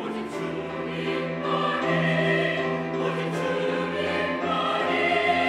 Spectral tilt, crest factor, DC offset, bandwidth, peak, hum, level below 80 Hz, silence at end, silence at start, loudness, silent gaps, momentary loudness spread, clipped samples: -6 dB/octave; 14 dB; under 0.1%; 11.5 kHz; -10 dBFS; none; -64 dBFS; 0 s; 0 s; -25 LUFS; none; 9 LU; under 0.1%